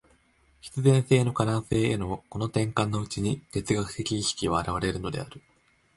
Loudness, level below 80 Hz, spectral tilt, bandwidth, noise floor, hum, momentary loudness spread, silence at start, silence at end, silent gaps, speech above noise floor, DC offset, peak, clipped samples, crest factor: -27 LUFS; -48 dBFS; -5.5 dB/octave; 11.5 kHz; -63 dBFS; none; 11 LU; 0.65 s; 0.55 s; none; 37 dB; under 0.1%; -8 dBFS; under 0.1%; 20 dB